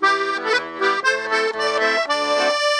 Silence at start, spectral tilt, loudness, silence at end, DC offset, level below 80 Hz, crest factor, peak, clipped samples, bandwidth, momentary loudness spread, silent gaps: 0 s; -1 dB/octave; -19 LUFS; 0 s; under 0.1%; -66 dBFS; 14 dB; -6 dBFS; under 0.1%; 12.5 kHz; 2 LU; none